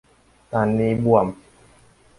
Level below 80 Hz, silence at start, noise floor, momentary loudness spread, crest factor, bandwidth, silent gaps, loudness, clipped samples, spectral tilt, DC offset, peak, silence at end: -50 dBFS; 0.5 s; -53 dBFS; 10 LU; 20 dB; 11.5 kHz; none; -20 LUFS; under 0.1%; -9 dB/octave; under 0.1%; -2 dBFS; 0.85 s